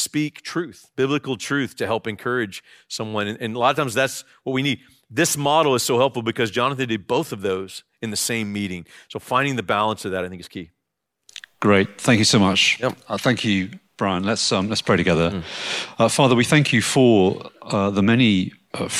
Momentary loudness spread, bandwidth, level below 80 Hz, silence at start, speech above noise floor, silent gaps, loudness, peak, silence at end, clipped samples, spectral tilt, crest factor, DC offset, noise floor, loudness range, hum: 14 LU; 16 kHz; -58 dBFS; 0 s; 58 dB; none; -20 LUFS; -2 dBFS; 0 s; under 0.1%; -4.5 dB/octave; 18 dB; under 0.1%; -79 dBFS; 6 LU; none